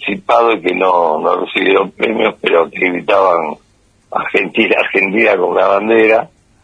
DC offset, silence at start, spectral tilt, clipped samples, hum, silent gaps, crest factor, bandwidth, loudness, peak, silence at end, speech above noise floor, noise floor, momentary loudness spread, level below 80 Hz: under 0.1%; 0 s; -6 dB/octave; under 0.1%; none; none; 14 dB; 10 kHz; -12 LUFS; 0 dBFS; 0.4 s; 40 dB; -52 dBFS; 5 LU; -56 dBFS